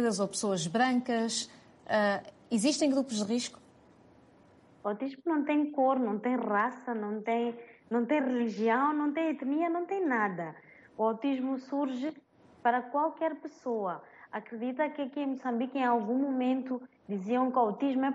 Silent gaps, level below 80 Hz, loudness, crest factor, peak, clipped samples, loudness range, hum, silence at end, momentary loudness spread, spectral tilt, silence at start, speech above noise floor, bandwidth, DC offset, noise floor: none; -78 dBFS; -31 LUFS; 16 dB; -16 dBFS; under 0.1%; 3 LU; none; 0 s; 10 LU; -4.5 dB/octave; 0 s; 30 dB; 11.5 kHz; under 0.1%; -60 dBFS